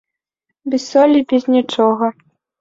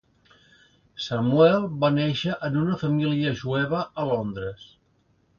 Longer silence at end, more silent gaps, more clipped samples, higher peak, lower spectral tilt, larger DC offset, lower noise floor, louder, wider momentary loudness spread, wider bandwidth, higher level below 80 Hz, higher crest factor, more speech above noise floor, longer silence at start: second, 0.5 s vs 0.75 s; neither; neither; first, -2 dBFS vs -6 dBFS; second, -5 dB/octave vs -7.5 dB/octave; neither; first, -77 dBFS vs -65 dBFS; first, -15 LUFS vs -24 LUFS; second, 10 LU vs 14 LU; about the same, 7.6 kHz vs 7 kHz; second, -64 dBFS vs -58 dBFS; about the same, 14 dB vs 18 dB; first, 63 dB vs 42 dB; second, 0.65 s vs 0.95 s